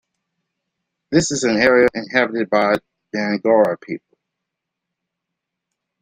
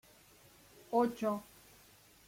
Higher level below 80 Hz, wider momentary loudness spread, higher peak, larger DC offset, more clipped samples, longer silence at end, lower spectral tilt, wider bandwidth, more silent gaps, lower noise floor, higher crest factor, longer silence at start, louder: first, -54 dBFS vs -74 dBFS; second, 14 LU vs 25 LU; first, -2 dBFS vs -20 dBFS; neither; neither; first, 2.05 s vs 0.85 s; second, -4.5 dB/octave vs -6 dB/octave; second, 10 kHz vs 16.5 kHz; neither; first, -81 dBFS vs -63 dBFS; about the same, 18 dB vs 20 dB; first, 1.1 s vs 0.9 s; first, -17 LUFS vs -35 LUFS